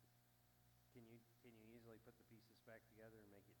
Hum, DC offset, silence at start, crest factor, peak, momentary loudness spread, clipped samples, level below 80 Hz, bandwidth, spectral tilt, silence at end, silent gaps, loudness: 60 Hz at -80 dBFS; under 0.1%; 0 s; 18 dB; -50 dBFS; 4 LU; under 0.1%; -86 dBFS; 19 kHz; -5.5 dB/octave; 0 s; none; -67 LUFS